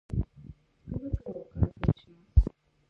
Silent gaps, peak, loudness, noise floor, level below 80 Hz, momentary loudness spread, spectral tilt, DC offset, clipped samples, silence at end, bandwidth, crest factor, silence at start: none; -8 dBFS; -32 LUFS; -51 dBFS; -34 dBFS; 20 LU; -10.5 dB/octave; under 0.1%; under 0.1%; 0.4 s; 4.5 kHz; 22 dB; 0.1 s